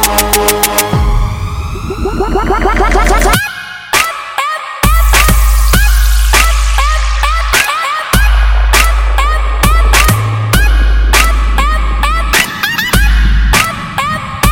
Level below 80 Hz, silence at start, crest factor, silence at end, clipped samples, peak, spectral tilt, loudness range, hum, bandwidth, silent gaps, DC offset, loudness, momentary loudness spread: -12 dBFS; 0 s; 10 dB; 0 s; 0.2%; 0 dBFS; -3.5 dB/octave; 2 LU; none; 17.5 kHz; none; under 0.1%; -11 LUFS; 7 LU